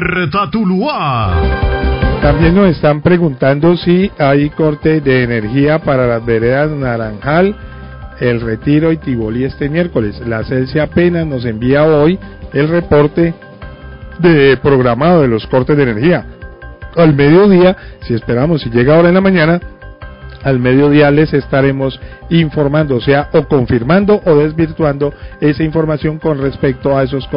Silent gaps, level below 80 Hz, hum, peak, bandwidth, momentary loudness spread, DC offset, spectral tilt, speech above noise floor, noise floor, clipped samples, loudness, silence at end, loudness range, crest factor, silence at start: none; -26 dBFS; none; 0 dBFS; 5.4 kHz; 11 LU; 0.3%; -13 dB/octave; 20 dB; -30 dBFS; under 0.1%; -12 LUFS; 0 s; 4 LU; 12 dB; 0 s